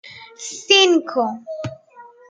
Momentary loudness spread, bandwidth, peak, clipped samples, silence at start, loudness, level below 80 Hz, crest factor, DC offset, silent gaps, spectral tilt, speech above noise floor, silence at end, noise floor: 20 LU; 9.4 kHz; -2 dBFS; under 0.1%; 0.05 s; -15 LUFS; -68 dBFS; 20 dB; under 0.1%; none; -2.5 dB/octave; 27 dB; 0.25 s; -45 dBFS